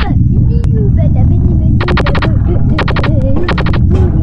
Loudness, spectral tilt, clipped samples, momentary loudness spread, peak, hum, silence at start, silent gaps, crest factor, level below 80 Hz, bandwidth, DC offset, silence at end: -11 LUFS; -9 dB/octave; under 0.1%; 2 LU; 0 dBFS; none; 0 s; none; 8 dB; -14 dBFS; 6 kHz; under 0.1%; 0 s